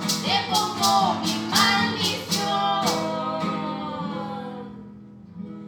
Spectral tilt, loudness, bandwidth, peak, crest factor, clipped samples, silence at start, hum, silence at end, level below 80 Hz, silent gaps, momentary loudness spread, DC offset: -3 dB/octave; -23 LUFS; over 20 kHz; -6 dBFS; 20 dB; under 0.1%; 0 s; none; 0 s; -62 dBFS; none; 19 LU; under 0.1%